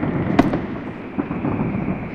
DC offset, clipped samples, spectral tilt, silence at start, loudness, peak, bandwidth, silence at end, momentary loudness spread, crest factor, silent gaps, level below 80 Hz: under 0.1%; under 0.1%; -8.5 dB/octave; 0 s; -22 LUFS; 0 dBFS; 8.6 kHz; 0 s; 10 LU; 22 dB; none; -40 dBFS